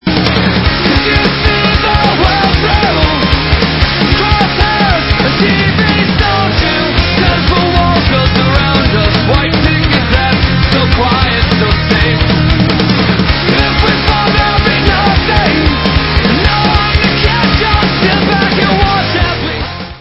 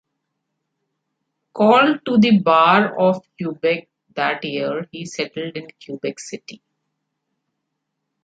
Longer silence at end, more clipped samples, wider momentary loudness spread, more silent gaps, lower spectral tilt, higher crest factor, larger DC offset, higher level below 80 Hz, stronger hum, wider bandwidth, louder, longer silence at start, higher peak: second, 0 s vs 1.7 s; first, 0.3% vs under 0.1%; second, 1 LU vs 20 LU; neither; first, -7.5 dB/octave vs -5.5 dB/octave; second, 10 dB vs 18 dB; neither; first, -18 dBFS vs -68 dBFS; neither; second, 8 kHz vs 9 kHz; first, -9 LUFS vs -18 LUFS; second, 0.05 s vs 1.55 s; about the same, 0 dBFS vs -2 dBFS